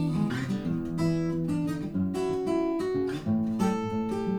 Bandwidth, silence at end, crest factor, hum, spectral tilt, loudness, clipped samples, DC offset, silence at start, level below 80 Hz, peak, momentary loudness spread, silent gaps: 19 kHz; 0 s; 14 dB; none; -7.5 dB/octave; -29 LUFS; under 0.1%; under 0.1%; 0 s; -54 dBFS; -14 dBFS; 3 LU; none